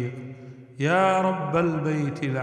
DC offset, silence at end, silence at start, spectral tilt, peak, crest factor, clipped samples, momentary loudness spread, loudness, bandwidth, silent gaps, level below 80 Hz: under 0.1%; 0 s; 0 s; -7 dB/octave; -8 dBFS; 16 dB; under 0.1%; 20 LU; -24 LUFS; 10.5 kHz; none; -60 dBFS